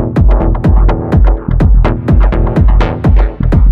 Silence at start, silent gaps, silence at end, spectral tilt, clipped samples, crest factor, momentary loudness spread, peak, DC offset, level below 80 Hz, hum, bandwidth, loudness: 0 s; none; 0 s; -10 dB/octave; under 0.1%; 8 dB; 2 LU; 0 dBFS; under 0.1%; -10 dBFS; none; 4.5 kHz; -11 LUFS